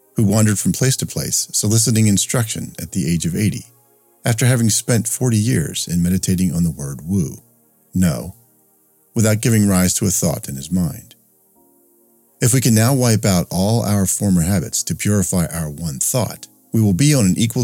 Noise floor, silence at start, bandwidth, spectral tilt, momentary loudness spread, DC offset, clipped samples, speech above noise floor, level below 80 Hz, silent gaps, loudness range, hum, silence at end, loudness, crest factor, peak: -57 dBFS; 0.15 s; 17 kHz; -5 dB/octave; 11 LU; under 0.1%; under 0.1%; 40 dB; -44 dBFS; none; 3 LU; none; 0 s; -17 LUFS; 18 dB; 0 dBFS